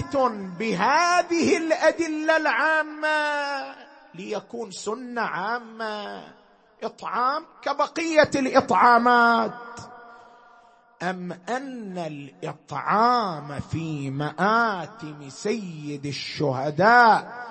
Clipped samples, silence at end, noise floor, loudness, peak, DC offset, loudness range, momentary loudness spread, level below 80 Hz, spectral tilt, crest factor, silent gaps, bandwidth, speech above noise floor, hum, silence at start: under 0.1%; 0 s; -55 dBFS; -23 LUFS; -4 dBFS; under 0.1%; 10 LU; 18 LU; -64 dBFS; -4.5 dB/octave; 20 dB; none; 8.8 kHz; 31 dB; none; 0 s